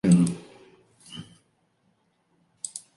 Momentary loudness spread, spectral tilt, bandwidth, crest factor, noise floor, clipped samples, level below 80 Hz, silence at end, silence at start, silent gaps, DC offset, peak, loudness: 28 LU; -6.5 dB/octave; 11.5 kHz; 20 dB; -69 dBFS; under 0.1%; -62 dBFS; 0.2 s; 0.05 s; none; under 0.1%; -8 dBFS; -26 LUFS